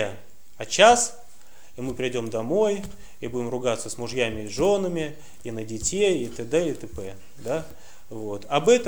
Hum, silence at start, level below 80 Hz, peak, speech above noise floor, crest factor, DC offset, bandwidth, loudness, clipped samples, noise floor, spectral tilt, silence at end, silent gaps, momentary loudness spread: none; 0 s; -50 dBFS; -2 dBFS; 30 dB; 22 dB; 1%; over 20 kHz; -24 LUFS; under 0.1%; -54 dBFS; -3.5 dB/octave; 0 s; none; 18 LU